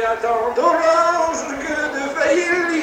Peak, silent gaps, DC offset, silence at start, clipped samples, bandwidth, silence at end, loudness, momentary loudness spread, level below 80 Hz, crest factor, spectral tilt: -4 dBFS; none; under 0.1%; 0 s; under 0.1%; 16 kHz; 0 s; -18 LUFS; 7 LU; -52 dBFS; 14 dB; -3 dB/octave